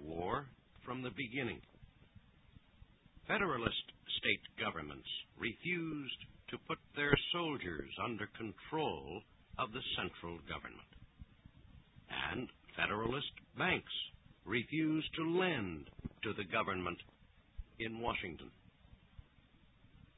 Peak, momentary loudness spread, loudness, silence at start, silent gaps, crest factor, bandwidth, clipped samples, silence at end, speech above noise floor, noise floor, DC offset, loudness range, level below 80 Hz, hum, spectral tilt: -12 dBFS; 17 LU; -40 LUFS; 0 s; none; 30 dB; 3.9 kHz; under 0.1%; 0.3 s; 27 dB; -67 dBFS; under 0.1%; 6 LU; -60 dBFS; none; -2 dB/octave